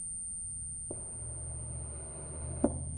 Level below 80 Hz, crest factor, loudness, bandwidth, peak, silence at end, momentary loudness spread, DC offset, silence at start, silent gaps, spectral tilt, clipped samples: -48 dBFS; 26 dB; -38 LUFS; 9.6 kHz; -12 dBFS; 0 s; 7 LU; under 0.1%; 0 s; none; -6 dB/octave; under 0.1%